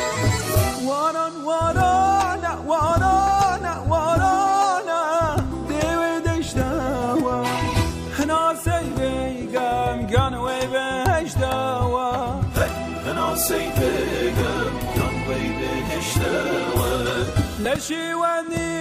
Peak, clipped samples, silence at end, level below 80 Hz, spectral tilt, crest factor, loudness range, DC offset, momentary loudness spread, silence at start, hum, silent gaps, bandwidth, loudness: -4 dBFS; under 0.1%; 0 s; -36 dBFS; -5 dB/octave; 18 dB; 3 LU; under 0.1%; 6 LU; 0 s; none; none; 16 kHz; -22 LUFS